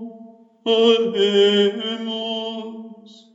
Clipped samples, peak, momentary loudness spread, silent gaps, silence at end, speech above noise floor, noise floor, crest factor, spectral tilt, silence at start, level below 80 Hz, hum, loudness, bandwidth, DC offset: under 0.1%; -4 dBFS; 18 LU; none; 0.4 s; 26 dB; -44 dBFS; 18 dB; -5 dB/octave; 0 s; under -90 dBFS; none; -19 LUFS; 7.8 kHz; under 0.1%